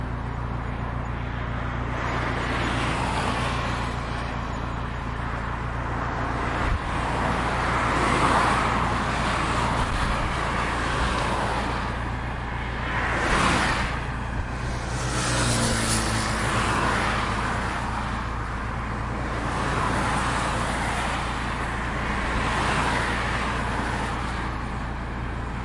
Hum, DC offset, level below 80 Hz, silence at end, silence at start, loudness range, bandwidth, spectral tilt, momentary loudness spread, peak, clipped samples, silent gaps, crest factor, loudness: none; under 0.1%; -32 dBFS; 0 s; 0 s; 4 LU; 11.5 kHz; -4.5 dB/octave; 8 LU; -8 dBFS; under 0.1%; none; 16 dB; -26 LUFS